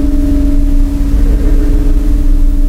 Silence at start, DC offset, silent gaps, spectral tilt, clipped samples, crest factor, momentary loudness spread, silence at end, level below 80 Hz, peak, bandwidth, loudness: 0 s; under 0.1%; none; -8 dB/octave; under 0.1%; 8 dB; 2 LU; 0 s; -8 dBFS; 0 dBFS; 5 kHz; -14 LUFS